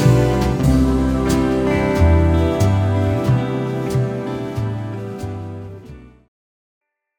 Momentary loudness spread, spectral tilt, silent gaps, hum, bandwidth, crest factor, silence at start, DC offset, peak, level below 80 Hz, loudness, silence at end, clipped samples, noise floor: 13 LU; -7.5 dB/octave; none; none; 19 kHz; 16 dB; 0 s; under 0.1%; -2 dBFS; -28 dBFS; -18 LUFS; 1.1 s; under 0.1%; -39 dBFS